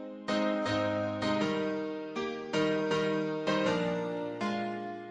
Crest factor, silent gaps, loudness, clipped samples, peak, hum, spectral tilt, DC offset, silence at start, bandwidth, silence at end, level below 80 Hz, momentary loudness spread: 14 dB; none; -32 LUFS; under 0.1%; -18 dBFS; none; -5.5 dB/octave; under 0.1%; 0 s; 10 kHz; 0 s; -66 dBFS; 7 LU